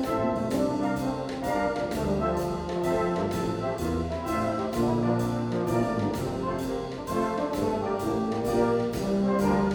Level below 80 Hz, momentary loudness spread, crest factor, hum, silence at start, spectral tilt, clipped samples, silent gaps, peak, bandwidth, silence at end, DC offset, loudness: -46 dBFS; 5 LU; 14 dB; none; 0 s; -7 dB/octave; under 0.1%; none; -12 dBFS; over 20 kHz; 0 s; under 0.1%; -28 LUFS